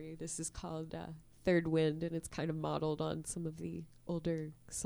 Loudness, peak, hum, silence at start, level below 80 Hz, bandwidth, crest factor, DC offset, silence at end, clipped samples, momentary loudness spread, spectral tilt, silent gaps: -38 LUFS; -18 dBFS; none; 0 s; -60 dBFS; over 20 kHz; 20 dB; under 0.1%; 0 s; under 0.1%; 12 LU; -5.5 dB/octave; none